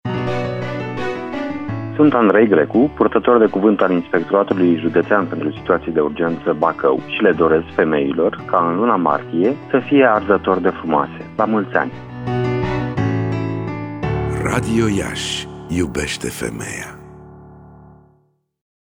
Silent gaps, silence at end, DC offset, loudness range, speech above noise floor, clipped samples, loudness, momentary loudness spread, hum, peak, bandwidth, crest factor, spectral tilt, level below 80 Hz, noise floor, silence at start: none; 1.2 s; under 0.1%; 7 LU; 44 dB; under 0.1%; -18 LUFS; 11 LU; none; -2 dBFS; 19 kHz; 16 dB; -6.5 dB/octave; -42 dBFS; -60 dBFS; 0.05 s